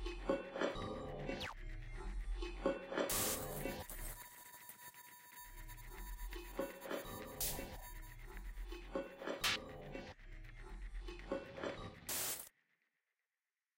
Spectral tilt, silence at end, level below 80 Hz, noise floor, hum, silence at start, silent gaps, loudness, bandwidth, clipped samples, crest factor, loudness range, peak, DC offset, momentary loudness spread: -3 dB/octave; 1.3 s; -52 dBFS; under -90 dBFS; none; 0 s; none; -44 LUFS; 16 kHz; under 0.1%; 20 dB; 6 LU; -24 dBFS; under 0.1%; 16 LU